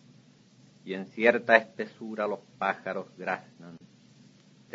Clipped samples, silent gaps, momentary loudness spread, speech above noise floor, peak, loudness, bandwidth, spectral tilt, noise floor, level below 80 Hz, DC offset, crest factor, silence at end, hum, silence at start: under 0.1%; none; 25 LU; 29 dB; -4 dBFS; -28 LUFS; 7.6 kHz; -5.5 dB/octave; -58 dBFS; -80 dBFS; under 0.1%; 28 dB; 0.95 s; none; 0.85 s